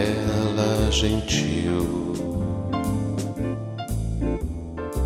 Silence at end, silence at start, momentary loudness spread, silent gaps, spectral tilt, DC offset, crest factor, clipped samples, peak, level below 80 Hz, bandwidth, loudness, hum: 0 s; 0 s; 9 LU; none; -5.5 dB/octave; under 0.1%; 16 dB; under 0.1%; -8 dBFS; -32 dBFS; 16 kHz; -25 LUFS; none